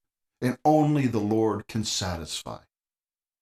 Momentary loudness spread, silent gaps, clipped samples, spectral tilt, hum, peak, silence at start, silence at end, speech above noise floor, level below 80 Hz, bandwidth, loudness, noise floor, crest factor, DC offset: 12 LU; none; under 0.1%; -5.5 dB/octave; none; -10 dBFS; 0.4 s; 0.85 s; over 65 dB; -54 dBFS; 15 kHz; -26 LUFS; under -90 dBFS; 18 dB; under 0.1%